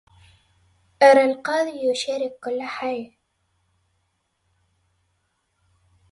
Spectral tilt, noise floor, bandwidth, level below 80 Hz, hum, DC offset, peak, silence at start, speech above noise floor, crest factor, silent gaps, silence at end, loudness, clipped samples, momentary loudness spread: -3 dB/octave; -72 dBFS; 11.5 kHz; -68 dBFS; none; under 0.1%; -2 dBFS; 1 s; 51 dB; 22 dB; none; 3.05 s; -21 LUFS; under 0.1%; 15 LU